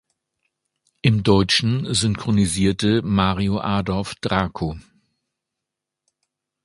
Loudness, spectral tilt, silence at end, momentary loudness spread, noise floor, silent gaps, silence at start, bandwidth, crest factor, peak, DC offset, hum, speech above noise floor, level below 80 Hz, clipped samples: -20 LUFS; -5 dB/octave; 1.85 s; 9 LU; -84 dBFS; none; 1.05 s; 11.5 kHz; 22 dB; 0 dBFS; under 0.1%; none; 64 dB; -42 dBFS; under 0.1%